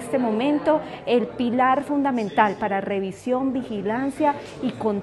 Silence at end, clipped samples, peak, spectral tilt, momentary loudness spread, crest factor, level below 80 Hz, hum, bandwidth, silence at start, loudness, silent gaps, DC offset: 0 s; under 0.1%; -4 dBFS; -6.5 dB/octave; 6 LU; 18 dB; -58 dBFS; none; 12 kHz; 0 s; -23 LUFS; none; under 0.1%